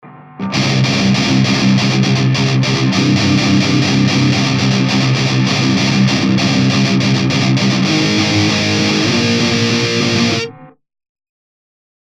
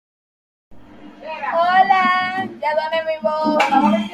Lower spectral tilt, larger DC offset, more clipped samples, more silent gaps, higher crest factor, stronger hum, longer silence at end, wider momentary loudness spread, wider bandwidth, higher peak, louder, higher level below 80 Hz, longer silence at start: about the same, -5 dB/octave vs -5 dB/octave; neither; neither; neither; second, 12 dB vs 18 dB; neither; first, 1.35 s vs 0 s; second, 1 LU vs 10 LU; second, 10.5 kHz vs 12.5 kHz; about the same, -2 dBFS vs -2 dBFS; first, -13 LUFS vs -17 LUFS; first, -46 dBFS vs -60 dBFS; second, 0.05 s vs 0.7 s